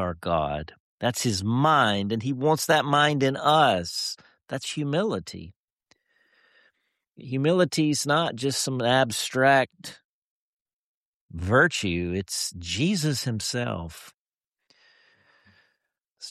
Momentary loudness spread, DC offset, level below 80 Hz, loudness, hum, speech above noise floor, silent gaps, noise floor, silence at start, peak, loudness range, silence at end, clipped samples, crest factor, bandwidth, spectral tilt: 15 LU; under 0.1%; -54 dBFS; -24 LUFS; none; 63 dB; 0.80-0.98 s, 5.56-5.76 s, 10.05-10.65 s, 10.73-11.29 s, 14.14-14.32 s, 14.47-14.52 s, 16.07-16.16 s; -87 dBFS; 0 s; -6 dBFS; 9 LU; 0 s; under 0.1%; 20 dB; 14 kHz; -4.5 dB/octave